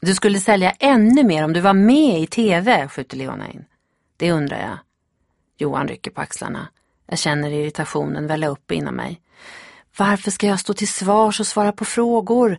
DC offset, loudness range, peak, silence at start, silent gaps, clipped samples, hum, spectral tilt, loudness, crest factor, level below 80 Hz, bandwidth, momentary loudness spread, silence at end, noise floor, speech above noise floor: under 0.1%; 10 LU; 0 dBFS; 0 s; none; under 0.1%; none; -5 dB/octave; -18 LUFS; 18 dB; -56 dBFS; 11.5 kHz; 16 LU; 0 s; -69 dBFS; 51 dB